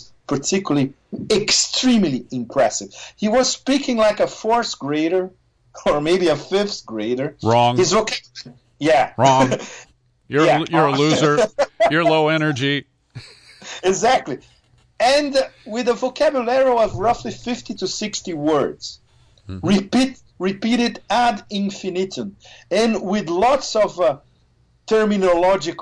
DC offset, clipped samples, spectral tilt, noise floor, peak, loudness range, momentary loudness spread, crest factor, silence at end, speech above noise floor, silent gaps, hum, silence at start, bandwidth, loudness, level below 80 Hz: under 0.1%; under 0.1%; -4 dB/octave; -58 dBFS; -2 dBFS; 4 LU; 11 LU; 18 dB; 0 s; 40 dB; none; none; 0.3 s; 10.5 kHz; -19 LUFS; -50 dBFS